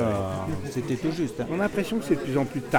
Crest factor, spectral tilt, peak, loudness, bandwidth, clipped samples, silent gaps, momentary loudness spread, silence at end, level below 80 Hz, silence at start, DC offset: 20 dB; -6.5 dB/octave; -8 dBFS; -28 LUFS; 19.5 kHz; under 0.1%; none; 5 LU; 0 s; -50 dBFS; 0 s; under 0.1%